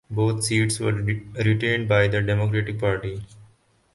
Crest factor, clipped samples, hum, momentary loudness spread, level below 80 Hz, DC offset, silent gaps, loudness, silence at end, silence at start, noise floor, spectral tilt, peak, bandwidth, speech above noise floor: 18 dB; under 0.1%; none; 8 LU; -46 dBFS; under 0.1%; none; -23 LUFS; 0.5 s; 0.1 s; -58 dBFS; -5.5 dB/octave; -4 dBFS; 11.5 kHz; 36 dB